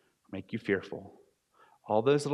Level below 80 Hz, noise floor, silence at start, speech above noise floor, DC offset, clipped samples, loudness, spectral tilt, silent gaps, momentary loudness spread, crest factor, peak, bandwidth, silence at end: -76 dBFS; -65 dBFS; 0.3 s; 35 dB; under 0.1%; under 0.1%; -31 LUFS; -6 dB/octave; none; 18 LU; 20 dB; -12 dBFS; 11.5 kHz; 0 s